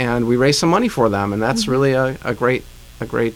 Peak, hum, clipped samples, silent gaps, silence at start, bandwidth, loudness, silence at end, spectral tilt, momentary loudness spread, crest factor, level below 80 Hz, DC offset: -4 dBFS; none; under 0.1%; none; 0 s; 17 kHz; -17 LUFS; 0 s; -5 dB/octave; 7 LU; 14 dB; -42 dBFS; under 0.1%